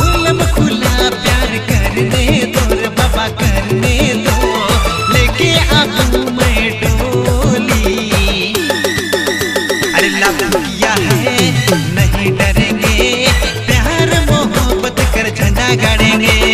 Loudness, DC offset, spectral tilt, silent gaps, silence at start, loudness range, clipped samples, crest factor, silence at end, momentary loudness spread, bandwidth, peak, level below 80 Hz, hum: -12 LUFS; under 0.1%; -4.5 dB/octave; none; 0 s; 1 LU; under 0.1%; 12 dB; 0 s; 4 LU; 15.5 kHz; 0 dBFS; -20 dBFS; none